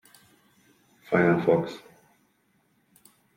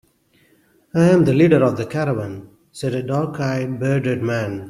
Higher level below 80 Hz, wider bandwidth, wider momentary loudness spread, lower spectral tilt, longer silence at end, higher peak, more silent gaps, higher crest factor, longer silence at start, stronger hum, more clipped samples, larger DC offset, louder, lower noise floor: second, -68 dBFS vs -54 dBFS; first, 16 kHz vs 13 kHz; first, 16 LU vs 12 LU; about the same, -8 dB/octave vs -7.5 dB/octave; first, 1.6 s vs 0 s; second, -6 dBFS vs -2 dBFS; neither; first, 24 dB vs 18 dB; first, 1.1 s vs 0.95 s; neither; neither; neither; second, -24 LUFS vs -19 LUFS; first, -68 dBFS vs -58 dBFS